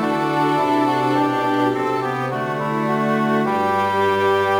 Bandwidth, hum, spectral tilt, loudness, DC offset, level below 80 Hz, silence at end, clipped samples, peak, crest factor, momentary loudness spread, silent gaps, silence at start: over 20 kHz; none; -6.5 dB/octave; -19 LUFS; under 0.1%; -64 dBFS; 0 s; under 0.1%; -6 dBFS; 12 dB; 4 LU; none; 0 s